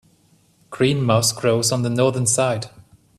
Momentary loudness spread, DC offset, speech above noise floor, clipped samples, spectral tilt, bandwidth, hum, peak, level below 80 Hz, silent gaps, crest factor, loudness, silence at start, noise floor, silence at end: 10 LU; under 0.1%; 39 dB; under 0.1%; -4.5 dB/octave; 14 kHz; none; -2 dBFS; -54 dBFS; none; 18 dB; -19 LUFS; 0.7 s; -58 dBFS; 0.4 s